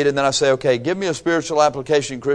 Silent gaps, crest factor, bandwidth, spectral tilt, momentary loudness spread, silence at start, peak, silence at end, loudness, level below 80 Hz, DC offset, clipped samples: none; 16 dB; 10.5 kHz; -4 dB/octave; 4 LU; 0 s; -2 dBFS; 0 s; -18 LUFS; -52 dBFS; under 0.1%; under 0.1%